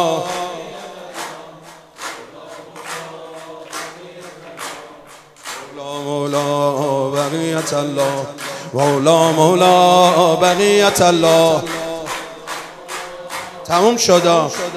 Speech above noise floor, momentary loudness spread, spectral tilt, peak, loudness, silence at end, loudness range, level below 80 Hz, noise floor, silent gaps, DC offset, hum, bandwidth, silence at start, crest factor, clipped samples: 28 dB; 21 LU; -4 dB/octave; 0 dBFS; -15 LUFS; 0 s; 19 LU; -56 dBFS; -41 dBFS; none; under 0.1%; none; 15.5 kHz; 0 s; 16 dB; under 0.1%